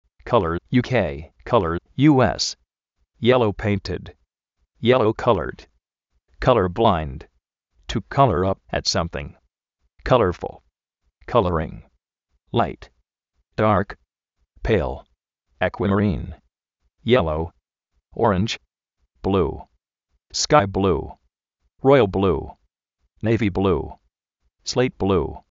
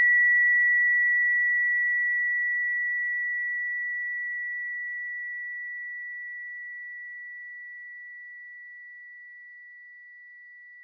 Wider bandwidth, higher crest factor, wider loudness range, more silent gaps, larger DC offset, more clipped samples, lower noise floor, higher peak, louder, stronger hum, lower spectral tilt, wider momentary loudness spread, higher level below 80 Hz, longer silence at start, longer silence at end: first, 7.6 kHz vs 2.2 kHz; first, 22 dB vs 12 dB; second, 4 LU vs 19 LU; neither; neither; neither; first, -73 dBFS vs -48 dBFS; first, -2 dBFS vs -16 dBFS; first, -21 LUFS vs -24 LUFS; neither; first, -5 dB/octave vs 4.5 dB/octave; second, 16 LU vs 24 LU; first, -40 dBFS vs under -90 dBFS; first, 0.25 s vs 0 s; first, 0.15 s vs 0 s